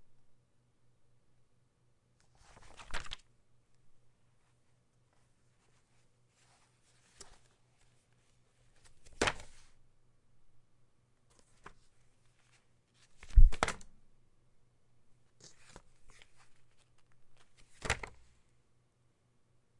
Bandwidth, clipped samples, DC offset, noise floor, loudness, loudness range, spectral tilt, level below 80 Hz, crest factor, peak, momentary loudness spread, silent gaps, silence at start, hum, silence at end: 11 kHz; under 0.1%; under 0.1%; -72 dBFS; -36 LUFS; 15 LU; -4 dB/octave; -38 dBFS; 28 dB; -8 dBFS; 29 LU; none; 2.9 s; none; 1.85 s